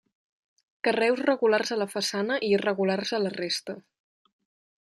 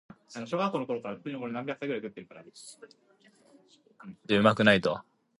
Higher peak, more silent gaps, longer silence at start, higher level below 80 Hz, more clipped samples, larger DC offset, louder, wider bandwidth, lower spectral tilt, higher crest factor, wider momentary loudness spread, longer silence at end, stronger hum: second, -10 dBFS vs -6 dBFS; neither; first, 0.85 s vs 0.3 s; second, -76 dBFS vs -66 dBFS; neither; neither; about the same, -26 LUFS vs -28 LUFS; first, 13 kHz vs 11.5 kHz; second, -4 dB/octave vs -5.5 dB/octave; second, 18 dB vs 24 dB; second, 6 LU vs 25 LU; first, 1.05 s vs 0.4 s; neither